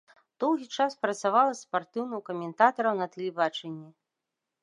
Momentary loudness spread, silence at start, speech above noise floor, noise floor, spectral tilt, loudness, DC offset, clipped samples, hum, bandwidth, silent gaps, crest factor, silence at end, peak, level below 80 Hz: 11 LU; 0.4 s; 58 dB; -86 dBFS; -4.5 dB/octave; -28 LUFS; under 0.1%; under 0.1%; none; 11 kHz; none; 22 dB; 0.75 s; -6 dBFS; -86 dBFS